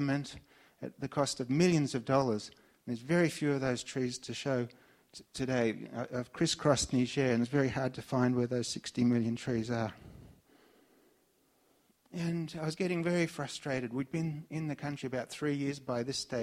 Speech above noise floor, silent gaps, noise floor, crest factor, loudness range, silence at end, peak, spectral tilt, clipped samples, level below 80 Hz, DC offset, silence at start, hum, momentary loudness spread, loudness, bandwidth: 38 dB; none; -71 dBFS; 22 dB; 6 LU; 0 s; -12 dBFS; -5.5 dB/octave; under 0.1%; -64 dBFS; under 0.1%; 0 s; none; 12 LU; -33 LUFS; 14.5 kHz